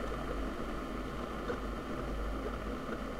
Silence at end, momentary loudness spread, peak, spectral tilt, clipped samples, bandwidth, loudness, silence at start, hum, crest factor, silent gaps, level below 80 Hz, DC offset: 0 s; 1 LU; -24 dBFS; -6 dB/octave; under 0.1%; 15.5 kHz; -40 LUFS; 0 s; none; 14 dB; none; -42 dBFS; under 0.1%